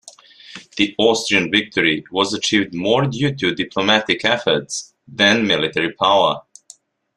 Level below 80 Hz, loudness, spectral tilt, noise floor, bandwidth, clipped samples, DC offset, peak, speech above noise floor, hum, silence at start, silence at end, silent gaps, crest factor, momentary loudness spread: -56 dBFS; -17 LUFS; -3.5 dB/octave; -48 dBFS; 12.5 kHz; under 0.1%; under 0.1%; 0 dBFS; 30 dB; none; 0.05 s; 0.75 s; none; 18 dB; 12 LU